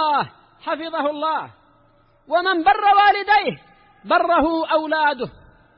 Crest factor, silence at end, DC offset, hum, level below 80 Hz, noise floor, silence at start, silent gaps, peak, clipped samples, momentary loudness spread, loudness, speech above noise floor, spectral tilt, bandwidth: 14 dB; 0.5 s; under 0.1%; none; -52 dBFS; -56 dBFS; 0 s; none; -6 dBFS; under 0.1%; 15 LU; -19 LUFS; 38 dB; -8.5 dB/octave; 5.6 kHz